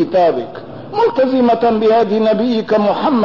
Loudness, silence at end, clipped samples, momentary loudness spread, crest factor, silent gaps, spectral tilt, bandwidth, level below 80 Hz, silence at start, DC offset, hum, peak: -14 LUFS; 0 s; under 0.1%; 11 LU; 8 dB; none; -7.5 dB/octave; 6 kHz; -50 dBFS; 0 s; 0.6%; none; -6 dBFS